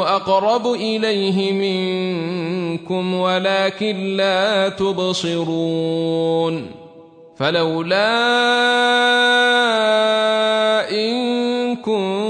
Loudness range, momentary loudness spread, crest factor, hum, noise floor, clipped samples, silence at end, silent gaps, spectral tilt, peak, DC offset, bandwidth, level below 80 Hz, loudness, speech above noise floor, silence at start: 5 LU; 8 LU; 14 dB; none; -43 dBFS; under 0.1%; 0 s; none; -4.5 dB/octave; -4 dBFS; under 0.1%; 10.5 kHz; -64 dBFS; -17 LUFS; 26 dB; 0 s